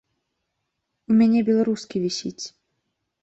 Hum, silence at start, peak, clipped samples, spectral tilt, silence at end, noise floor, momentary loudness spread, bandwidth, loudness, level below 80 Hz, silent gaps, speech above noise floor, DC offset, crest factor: none; 1.1 s; -10 dBFS; under 0.1%; -5.5 dB/octave; 0.75 s; -78 dBFS; 17 LU; 8 kHz; -21 LUFS; -64 dBFS; none; 57 dB; under 0.1%; 14 dB